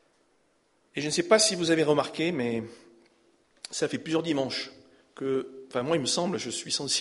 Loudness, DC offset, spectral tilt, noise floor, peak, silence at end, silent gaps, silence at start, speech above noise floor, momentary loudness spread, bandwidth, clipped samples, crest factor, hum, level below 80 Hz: -27 LUFS; under 0.1%; -3.5 dB/octave; -69 dBFS; -8 dBFS; 0 s; none; 0.95 s; 41 dB; 14 LU; 11.5 kHz; under 0.1%; 22 dB; none; -70 dBFS